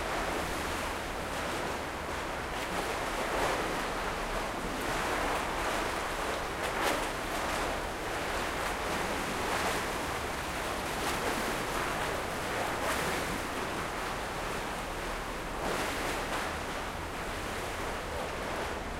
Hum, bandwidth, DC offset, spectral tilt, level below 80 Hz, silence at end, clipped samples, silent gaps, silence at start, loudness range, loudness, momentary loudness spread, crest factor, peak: none; 16 kHz; under 0.1%; -3.5 dB/octave; -46 dBFS; 0 s; under 0.1%; none; 0 s; 2 LU; -33 LUFS; 5 LU; 18 dB; -16 dBFS